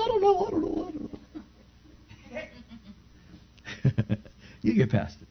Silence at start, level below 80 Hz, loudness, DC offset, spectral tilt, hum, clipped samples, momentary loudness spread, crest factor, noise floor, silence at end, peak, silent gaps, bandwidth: 0 s; -52 dBFS; -28 LUFS; under 0.1%; -8 dB/octave; 60 Hz at -55 dBFS; under 0.1%; 23 LU; 18 dB; -55 dBFS; 0.05 s; -12 dBFS; none; 6.4 kHz